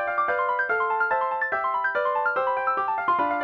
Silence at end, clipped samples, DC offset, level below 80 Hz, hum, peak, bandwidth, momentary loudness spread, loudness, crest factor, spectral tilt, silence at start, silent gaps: 0 s; under 0.1%; under 0.1%; -66 dBFS; none; -12 dBFS; 6 kHz; 1 LU; -24 LUFS; 12 dB; -5.5 dB/octave; 0 s; none